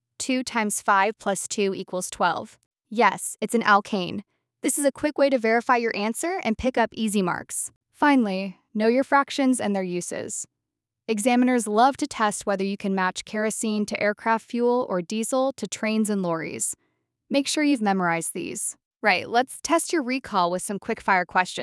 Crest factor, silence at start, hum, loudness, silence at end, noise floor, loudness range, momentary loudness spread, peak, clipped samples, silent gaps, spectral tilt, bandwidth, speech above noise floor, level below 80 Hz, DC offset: 20 dB; 0.2 s; none; -24 LUFS; 0 s; -85 dBFS; 2 LU; 9 LU; -4 dBFS; under 0.1%; 2.66-2.71 s, 7.76-7.81 s, 18.86-18.91 s; -3.5 dB/octave; 12 kHz; 61 dB; -60 dBFS; under 0.1%